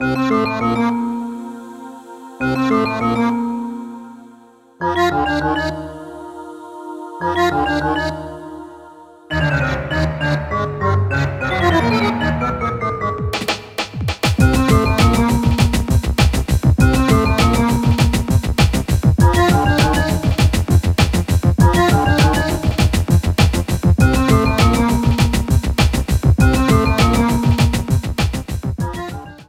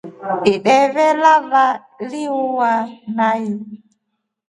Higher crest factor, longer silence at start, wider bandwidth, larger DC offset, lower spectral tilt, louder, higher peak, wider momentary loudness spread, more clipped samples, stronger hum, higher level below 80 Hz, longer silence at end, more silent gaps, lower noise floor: about the same, 16 dB vs 16 dB; about the same, 0 s vs 0.05 s; first, 16.5 kHz vs 11.5 kHz; neither; about the same, -6 dB/octave vs -5 dB/octave; about the same, -16 LUFS vs -16 LUFS; about the same, 0 dBFS vs 0 dBFS; about the same, 15 LU vs 13 LU; neither; neither; first, -24 dBFS vs -62 dBFS; second, 0.05 s vs 0.75 s; neither; second, -46 dBFS vs -74 dBFS